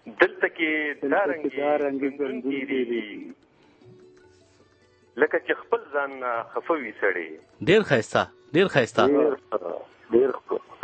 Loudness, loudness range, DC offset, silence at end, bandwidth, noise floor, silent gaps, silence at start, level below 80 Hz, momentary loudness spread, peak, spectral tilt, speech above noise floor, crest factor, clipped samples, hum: -25 LUFS; 7 LU; under 0.1%; 0.1 s; 8.8 kHz; -59 dBFS; none; 0.05 s; -66 dBFS; 11 LU; -2 dBFS; -5.5 dB/octave; 35 dB; 24 dB; under 0.1%; none